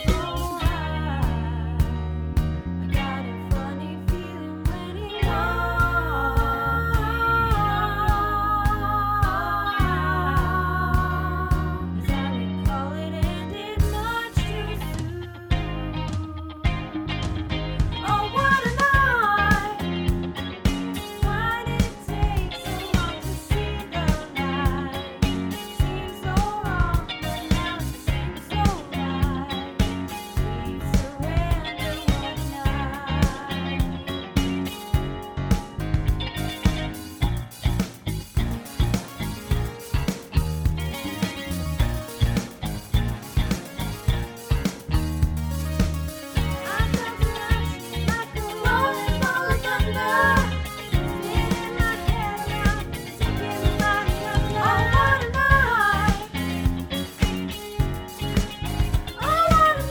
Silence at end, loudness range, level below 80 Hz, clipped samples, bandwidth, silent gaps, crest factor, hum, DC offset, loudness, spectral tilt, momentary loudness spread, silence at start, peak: 0 s; 6 LU; -30 dBFS; under 0.1%; over 20 kHz; none; 20 dB; none; under 0.1%; -25 LUFS; -5.5 dB/octave; 9 LU; 0 s; -2 dBFS